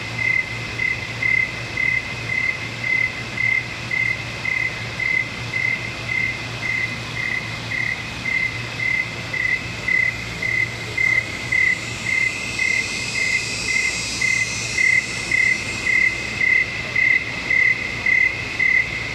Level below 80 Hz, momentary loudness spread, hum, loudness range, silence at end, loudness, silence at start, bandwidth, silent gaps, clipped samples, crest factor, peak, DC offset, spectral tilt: -44 dBFS; 7 LU; none; 5 LU; 0 s; -19 LUFS; 0 s; 15 kHz; none; under 0.1%; 14 dB; -6 dBFS; under 0.1%; -2.5 dB/octave